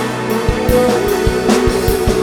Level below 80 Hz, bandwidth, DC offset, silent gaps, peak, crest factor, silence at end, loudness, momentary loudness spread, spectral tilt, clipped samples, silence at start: -24 dBFS; over 20 kHz; under 0.1%; none; 0 dBFS; 14 dB; 0 s; -14 LUFS; 4 LU; -5.5 dB/octave; under 0.1%; 0 s